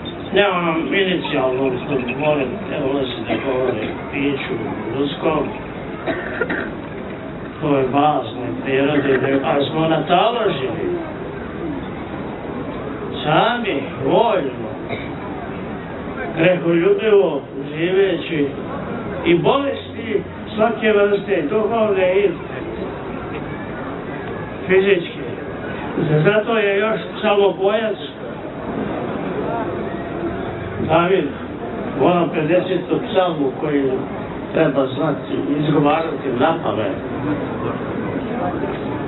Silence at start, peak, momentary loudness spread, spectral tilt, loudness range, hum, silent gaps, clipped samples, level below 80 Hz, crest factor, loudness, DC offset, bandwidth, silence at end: 0 s; 0 dBFS; 12 LU; -11 dB/octave; 4 LU; none; none; under 0.1%; -46 dBFS; 18 dB; -20 LUFS; under 0.1%; 4.2 kHz; 0 s